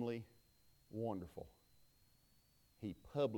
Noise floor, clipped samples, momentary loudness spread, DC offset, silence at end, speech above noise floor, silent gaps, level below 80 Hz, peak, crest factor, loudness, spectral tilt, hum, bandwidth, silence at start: -73 dBFS; under 0.1%; 14 LU; under 0.1%; 0 s; 30 dB; none; -72 dBFS; -28 dBFS; 20 dB; -47 LUFS; -7.5 dB/octave; none; 19 kHz; 0 s